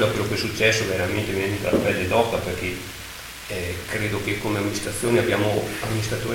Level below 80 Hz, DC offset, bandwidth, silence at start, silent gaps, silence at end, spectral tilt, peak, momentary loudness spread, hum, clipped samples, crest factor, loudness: -44 dBFS; under 0.1%; 17 kHz; 0 s; none; 0 s; -4.5 dB/octave; -4 dBFS; 10 LU; none; under 0.1%; 20 dB; -23 LUFS